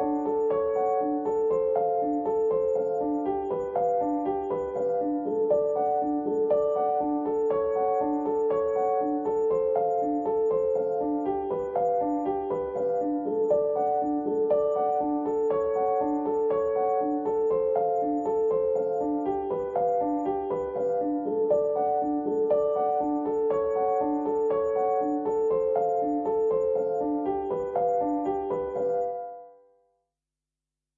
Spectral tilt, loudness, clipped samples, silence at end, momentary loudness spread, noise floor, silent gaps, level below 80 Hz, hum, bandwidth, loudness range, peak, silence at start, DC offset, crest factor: -9 dB/octave; -27 LUFS; under 0.1%; 1.45 s; 4 LU; -89 dBFS; none; -60 dBFS; none; 7.2 kHz; 1 LU; -14 dBFS; 0 s; under 0.1%; 14 dB